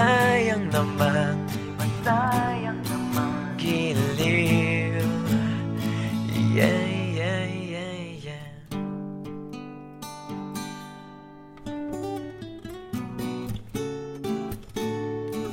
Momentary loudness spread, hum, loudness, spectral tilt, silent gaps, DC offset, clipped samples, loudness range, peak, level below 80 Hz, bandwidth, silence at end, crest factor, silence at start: 17 LU; none; -26 LUFS; -6 dB/octave; none; under 0.1%; under 0.1%; 12 LU; -6 dBFS; -52 dBFS; 17 kHz; 0 s; 20 dB; 0 s